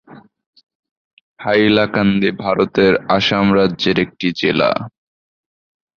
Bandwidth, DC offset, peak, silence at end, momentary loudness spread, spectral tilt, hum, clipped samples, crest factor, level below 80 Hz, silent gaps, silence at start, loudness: 6.8 kHz; under 0.1%; -2 dBFS; 1.1 s; 5 LU; -6.5 dB/octave; none; under 0.1%; 16 dB; -48 dBFS; 0.46-0.53 s, 0.63-0.67 s, 0.75-0.83 s, 0.91-1.36 s; 0.1 s; -15 LUFS